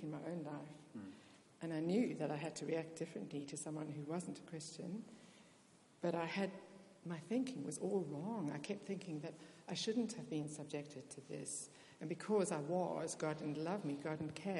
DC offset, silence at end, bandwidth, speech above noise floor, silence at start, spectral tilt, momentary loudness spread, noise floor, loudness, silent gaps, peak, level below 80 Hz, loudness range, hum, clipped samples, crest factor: under 0.1%; 0 s; 11.5 kHz; 25 dB; 0 s; -5.5 dB/octave; 15 LU; -68 dBFS; -44 LUFS; none; -26 dBFS; -88 dBFS; 4 LU; none; under 0.1%; 18 dB